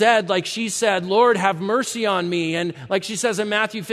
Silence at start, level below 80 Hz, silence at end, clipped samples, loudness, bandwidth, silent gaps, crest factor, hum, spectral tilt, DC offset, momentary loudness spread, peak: 0 s; -68 dBFS; 0 s; under 0.1%; -20 LUFS; 14 kHz; none; 18 dB; none; -3.5 dB/octave; under 0.1%; 7 LU; -2 dBFS